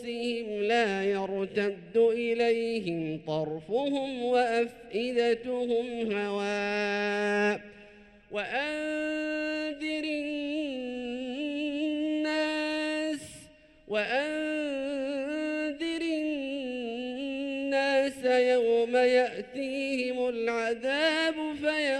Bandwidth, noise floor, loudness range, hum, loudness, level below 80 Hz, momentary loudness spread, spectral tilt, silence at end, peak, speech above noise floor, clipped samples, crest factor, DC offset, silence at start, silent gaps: 11.5 kHz; -54 dBFS; 5 LU; none; -29 LUFS; -66 dBFS; 9 LU; -4.5 dB/octave; 0 s; -14 dBFS; 25 dB; under 0.1%; 16 dB; under 0.1%; 0 s; none